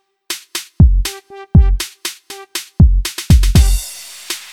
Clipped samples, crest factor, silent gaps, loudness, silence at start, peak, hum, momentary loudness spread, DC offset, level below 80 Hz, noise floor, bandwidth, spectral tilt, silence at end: under 0.1%; 14 dB; none; -15 LUFS; 0.3 s; 0 dBFS; none; 13 LU; under 0.1%; -16 dBFS; -31 dBFS; 17 kHz; -5 dB/octave; 0.1 s